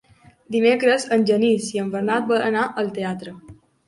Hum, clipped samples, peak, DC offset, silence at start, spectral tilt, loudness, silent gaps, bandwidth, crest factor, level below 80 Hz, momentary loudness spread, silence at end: none; under 0.1%; -4 dBFS; under 0.1%; 0.5 s; -5 dB/octave; -20 LUFS; none; 11.5 kHz; 18 dB; -62 dBFS; 10 LU; 0.35 s